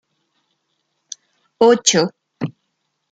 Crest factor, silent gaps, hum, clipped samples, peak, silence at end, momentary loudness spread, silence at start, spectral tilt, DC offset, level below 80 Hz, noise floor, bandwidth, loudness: 20 dB; none; none; under 0.1%; 0 dBFS; 0.6 s; 23 LU; 1.6 s; -3 dB/octave; under 0.1%; -66 dBFS; -72 dBFS; 9.6 kHz; -17 LUFS